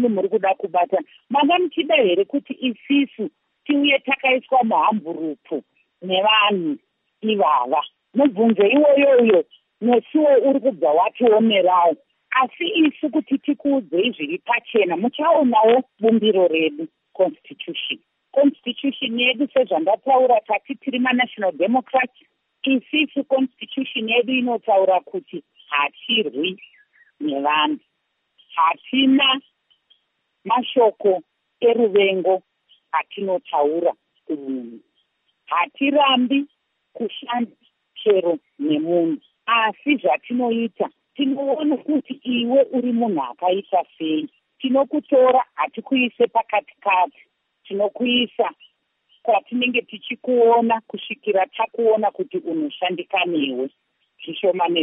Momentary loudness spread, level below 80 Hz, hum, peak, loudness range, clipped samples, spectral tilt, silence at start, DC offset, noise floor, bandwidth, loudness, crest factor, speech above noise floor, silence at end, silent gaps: 12 LU; -82 dBFS; none; -4 dBFS; 5 LU; under 0.1%; -1.5 dB/octave; 0 s; under 0.1%; -73 dBFS; 3.8 kHz; -20 LUFS; 16 dB; 54 dB; 0 s; none